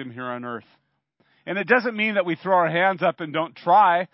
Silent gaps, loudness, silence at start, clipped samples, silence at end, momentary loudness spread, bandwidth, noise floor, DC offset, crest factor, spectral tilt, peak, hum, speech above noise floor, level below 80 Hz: none; -21 LUFS; 0 s; under 0.1%; 0.1 s; 15 LU; 5.8 kHz; -67 dBFS; under 0.1%; 20 dB; -9.5 dB/octave; -2 dBFS; none; 45 dB; -78 dBFS